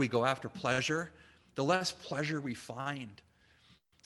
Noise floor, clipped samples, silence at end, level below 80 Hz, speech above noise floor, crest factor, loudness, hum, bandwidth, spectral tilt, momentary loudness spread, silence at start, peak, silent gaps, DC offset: -66 dBFS; under 0.1%; 0.9 s; -70 dBFS; 32 dB; 22 dB; -34 LUFS; none; 12.5 kHz; -4.5 dB/octave; 13 LU; 0 s; -14 dBFS; none; under 0.1%